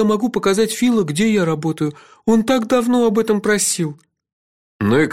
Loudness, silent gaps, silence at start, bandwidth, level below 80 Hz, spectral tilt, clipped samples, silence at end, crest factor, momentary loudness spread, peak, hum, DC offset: -17 LUFS; 4.33-4.79 s; 0 s; 16.5 kHz; -52 dBFS; -5 dB/octave; under 0.1%; 0 s; 14 dB; 7 LU; -4 dBFS; none; 0.3%